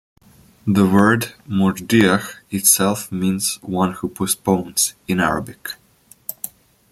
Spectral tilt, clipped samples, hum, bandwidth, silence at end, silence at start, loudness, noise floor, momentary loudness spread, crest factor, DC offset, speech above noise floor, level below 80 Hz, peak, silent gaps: -4 dB/octave; under 0.1%; none; 16.5 kHz; 0.45 s; 0.65 s; -18 LUFS; -49 dBFS; 18 LU; 20 dB; under 0.1%; 31 dB; -52 dBFS; 0 dBFS; none